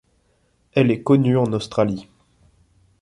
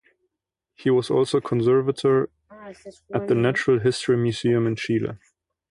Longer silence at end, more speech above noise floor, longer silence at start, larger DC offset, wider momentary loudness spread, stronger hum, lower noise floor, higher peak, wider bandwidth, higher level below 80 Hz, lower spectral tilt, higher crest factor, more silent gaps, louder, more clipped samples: first, 1 s vs 0.55 s; second, 45 dB vs 61 dB; about the same, 0.75 s vs 0.8 s; neither; second, 7 LU vs 10 LU; neither; second, -63 dBFS vs -83 dBFS; about the same, -4 dBFS vs -6 dBFS; about the same, 11 kHz vs 11 kHz; about the same, -56 dBFS vs -58 dBFS; first, -8 dB/octave vs -6.5 dB/octave; about the same, 18 dB vs 16 dB; neither; first, -19 LUFS vs -22 LUFS; neither